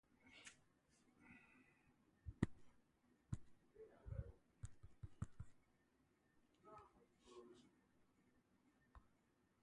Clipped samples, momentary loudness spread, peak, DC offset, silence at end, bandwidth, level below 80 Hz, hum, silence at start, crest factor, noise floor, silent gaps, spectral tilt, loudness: under 0.1%; 19 LU; -24 dBFS; under 0.1%; 0.55 s; 11 kHz; -66 dBFS; none; 0.1 s; 34 dB; -81 dBFS; none; -7 dB/octave; -56 LUFS